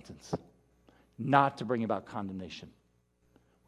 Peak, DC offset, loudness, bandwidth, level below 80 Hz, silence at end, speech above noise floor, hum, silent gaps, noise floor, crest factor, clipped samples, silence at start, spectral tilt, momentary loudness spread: -8 dBFS; under 0.1%; -32 LUFS; 12.5 kHz; -64 dBFS; 1 s; 39 dB; 60 Hz at -65 dBFS; none; -71 dBFS; 26 dB; under 0.1%; 0.05 s; -6.5 dB/octave; 16 LU